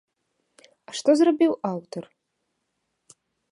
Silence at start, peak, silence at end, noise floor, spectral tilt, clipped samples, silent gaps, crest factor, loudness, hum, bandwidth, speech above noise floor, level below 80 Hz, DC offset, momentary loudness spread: 0.9 s; -8 dBFS; 1.5 s; -77 dBFS; -5.5 dB/octave; under 0.1%; none; 20 dB; -22 LUFS; none; 11 kHz; 56 dB; -78 dBFS; under 0.1%; 19 LU